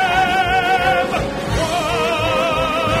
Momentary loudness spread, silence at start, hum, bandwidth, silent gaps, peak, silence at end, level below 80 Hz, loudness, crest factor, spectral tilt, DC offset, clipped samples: 5 LU; 0 s; none; 16 kHz; none; -2 dBFS; 0 s; -34 dBFS; -17 LUFS; 14 dB; -4 dB/octave; under 0.1%; under 0.1%